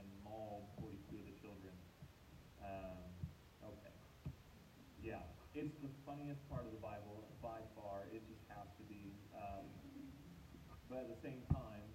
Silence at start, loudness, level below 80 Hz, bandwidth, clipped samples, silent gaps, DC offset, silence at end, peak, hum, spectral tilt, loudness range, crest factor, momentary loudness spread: 0 s; -53 LUFS; -64 dBFS; 16 kHz; under 0.1%; none; under 0.1%; 0 s; -26 dBFS; none; -7.5 dB/octave; 5 LU; 26 dB; 11 LU